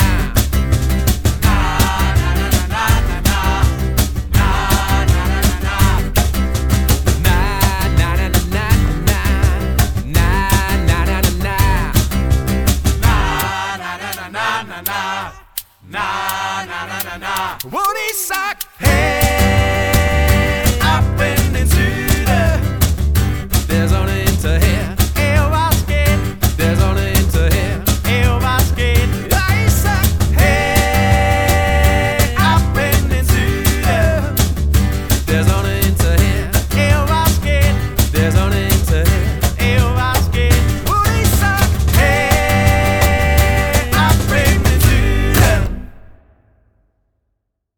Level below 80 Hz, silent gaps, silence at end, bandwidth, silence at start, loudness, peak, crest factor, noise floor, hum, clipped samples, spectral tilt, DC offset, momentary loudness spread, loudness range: -18 dBFS; none; 1.7 s; over 20 kHz; 0 s; -15 LUFS; -2 dBFS; 12 dB; -71 dBFS; none; under 0.1%; -5 dB/octave; 0.2%; 6 LU; 4 LU